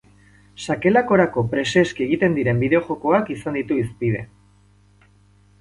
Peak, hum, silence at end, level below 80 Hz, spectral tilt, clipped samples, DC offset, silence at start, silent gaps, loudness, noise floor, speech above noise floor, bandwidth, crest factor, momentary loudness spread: -2 dBFS; 50 Hz at -45 dBFS; 1.35 s; -52 dBFS; -6.5 dB/octave; under 0.1%; under 0.1%; 0.6 s; none; -20 LUFS; -54 dBFS; 35 dB; 11.5 kHz; 18 dB; 8 LU